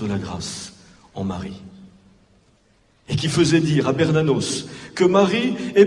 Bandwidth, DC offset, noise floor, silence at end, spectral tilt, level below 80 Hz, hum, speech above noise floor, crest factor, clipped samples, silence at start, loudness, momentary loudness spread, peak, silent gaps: 11.5 kHz; under 0.1%; -59 dBFS; 0 s; -5.5 dB/octave; -54 dBFS; none; 39 dB; 20 dB; under 0.1%; 0 s; -20 LUFS; 16 LU; -2 dBFS; none